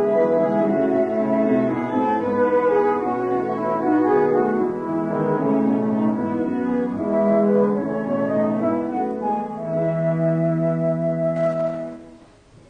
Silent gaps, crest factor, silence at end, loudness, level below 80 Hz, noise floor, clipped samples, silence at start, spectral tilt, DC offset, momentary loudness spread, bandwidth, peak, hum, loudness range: none; 14 dB; 0.55 s; -21 LUFS; -56 dBFS; -49 dBFS; under 0.1%; 0 s; -10 dB/octave; under 0.1%; 6 LU; 7 kHz; -6 dBFS; none; 2 LU